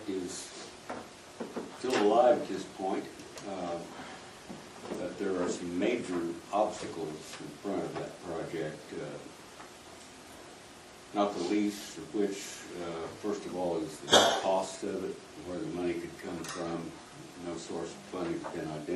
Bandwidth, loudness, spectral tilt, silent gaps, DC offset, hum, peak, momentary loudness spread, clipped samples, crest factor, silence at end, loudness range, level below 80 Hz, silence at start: 13 kHz; -33 LUFS; -3.5 dB/octave; none; under 0.1%; none; -8 dBFS; 20 LU; under 0.1%; 26 dB; 0 s; 9 LU; -68 dBFS; 0 s